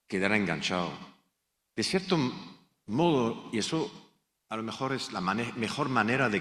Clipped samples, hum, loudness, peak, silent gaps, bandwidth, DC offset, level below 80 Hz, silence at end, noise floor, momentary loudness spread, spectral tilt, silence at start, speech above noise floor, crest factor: under 0.1%; none; -30 LUFS; -10 dBFS; none; 13.5 kHz; under 0.1%; -66 dBFS; 0 s; -79 dBFS; 12 LU; -5 dB/octave; 0.1 s; 50 dB; 22 dB